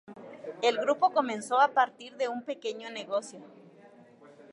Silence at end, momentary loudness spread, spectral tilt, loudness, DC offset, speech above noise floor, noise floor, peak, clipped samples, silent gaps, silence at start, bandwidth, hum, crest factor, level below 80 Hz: 1.05 s; 19 LU; -3 dB/octave; -29 LUFS; under 0.1%; 26 dB; -55 dBFS; -12 dBFS; under 0.1%; none; 0.1 s; 11.5 kHz; none; 20 dB; -88 dBFS